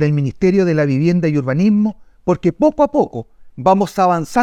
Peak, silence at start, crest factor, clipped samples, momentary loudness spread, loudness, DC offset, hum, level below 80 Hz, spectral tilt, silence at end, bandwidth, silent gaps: 0 dBFS; 0 s; 14 dB; under 0.1%; 6 LU; -16 LUFS; under 0.1%; none; -46 dBFS; -8 dB/octave; 0 s; 13.5 kHz; none